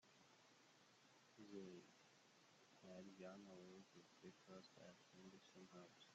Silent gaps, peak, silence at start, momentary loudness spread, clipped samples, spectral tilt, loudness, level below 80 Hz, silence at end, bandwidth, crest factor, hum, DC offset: none; -46 dBFS; 0 s; 7 LU; under 0.1%; -4.5 dB/octave; -63 LUFS; under -90 dBFS; 0 s; 8 kHz; 20 dB; none; under 0.1%